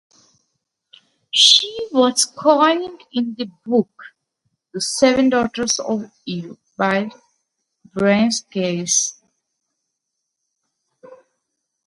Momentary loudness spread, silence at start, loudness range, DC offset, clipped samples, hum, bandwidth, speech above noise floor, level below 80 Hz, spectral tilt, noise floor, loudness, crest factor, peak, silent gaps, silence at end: 16 LU; 1.35 s; 6 LU; under 0.1%; under 0.1%; none; 11.5 kHz; 60 dB; -60 dBFS; -2.5 dB/octave; -78 dBFS; -17 LUFS; 20 dB; 0 dBFS; none; 0.7 s